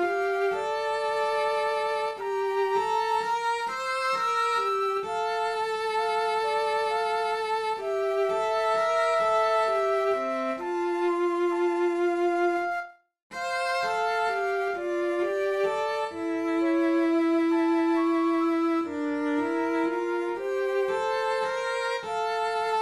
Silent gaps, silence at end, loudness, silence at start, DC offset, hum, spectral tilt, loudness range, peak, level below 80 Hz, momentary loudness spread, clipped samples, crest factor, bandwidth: 13.22-13.30 s; 0 s; -27 LUFS; 0 s; under 0.1%; none; -3.5 dB/octave; 3 LU; -14 dBFS; -70 dBFS; 5 LU; under 0.1%; 12 dB; 12.5 kHz